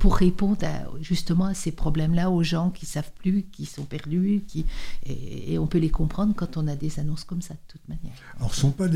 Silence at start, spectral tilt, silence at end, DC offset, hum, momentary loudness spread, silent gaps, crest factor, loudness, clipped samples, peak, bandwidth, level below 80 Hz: 0 s; -6.5 dB/octave; 0 s; under 0.1%; none; 14 LU; none; 18 dB; -26 LUFS; under 0.1%; -4 dBFS; 14 kHz; -32 dBFS